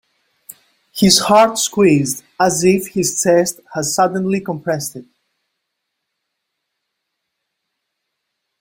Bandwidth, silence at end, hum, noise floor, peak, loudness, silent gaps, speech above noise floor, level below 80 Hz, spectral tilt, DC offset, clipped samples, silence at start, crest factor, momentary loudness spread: 16.5 kHz; 3.6 s; none; -76 dBFS; 0 dBFS; -15 LUFS; none; 61 dB; -54 dBFS; -4 dB/octave; under 0.1%; under 0.1%; 0.95 s; 18 dB; 10 LU